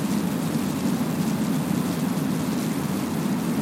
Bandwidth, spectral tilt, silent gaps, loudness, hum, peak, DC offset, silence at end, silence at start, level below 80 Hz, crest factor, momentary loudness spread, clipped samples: 17 kHz; -6 dB/octave; none; -25 LUFS; none; -12 dBFS; under 0.1%; 0 s; 0 s; -56 dBFS; 12 dB; 1 LU; under 0.1%